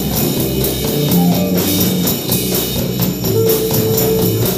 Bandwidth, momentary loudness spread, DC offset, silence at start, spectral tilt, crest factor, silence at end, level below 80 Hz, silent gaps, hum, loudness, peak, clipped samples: 16 kHz; 3 LU; under 0.1%; 0 s; -5 dB/octave; 14 dB; 0 s; -34 dBFS; none; none; -14 LUFS; 0 dBFS; under 0.1%